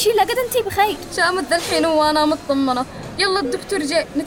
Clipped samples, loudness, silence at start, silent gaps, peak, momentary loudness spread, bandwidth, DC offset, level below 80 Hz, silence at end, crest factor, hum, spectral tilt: under 0.1%; -19 LUFS; 0 s; none; -6 dBFS; 6 LU; over 20 kHz; under 0.1%; -46 dBFS; 0 s; 12 dB; none; -3 dB/octave